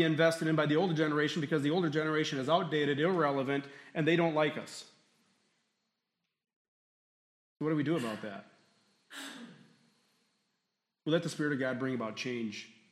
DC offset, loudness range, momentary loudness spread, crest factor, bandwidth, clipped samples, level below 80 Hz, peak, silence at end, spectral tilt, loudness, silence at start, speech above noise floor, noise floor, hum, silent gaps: under 0.1%; 11 LU; 16 LU; 20 dB; 13.5 kHz; under 0.1%; -82 dBFS; -14 dBFS; 0.25 s; -6 dB/octave; -32 LUFS; 0 s; 55 dB; -86 dBFS; none; 6.56-7.56 s